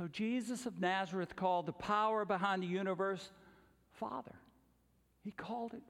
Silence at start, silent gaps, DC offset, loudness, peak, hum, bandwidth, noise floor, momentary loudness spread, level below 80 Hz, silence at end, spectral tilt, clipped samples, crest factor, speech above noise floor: 0 s; none; under 0.1%; -38 LUFS; -22 dBFS; none; 13.5 kHz; -74 dBFS; 13 LU; -74 dBFS; 0.05 s; -5.5 dB/octave; under 0.1%; 18 dB; 35 dB